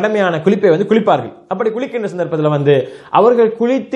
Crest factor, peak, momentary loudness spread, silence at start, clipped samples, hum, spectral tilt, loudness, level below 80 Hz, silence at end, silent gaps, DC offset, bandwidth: 14 dB; 0 dBFS; 8 LU; 0 s; under 0.1%; none; -7.5 dB/octave; -14 LUFS; -66 dBFS; 0 s; none; under 0.1%; 8.4 kHz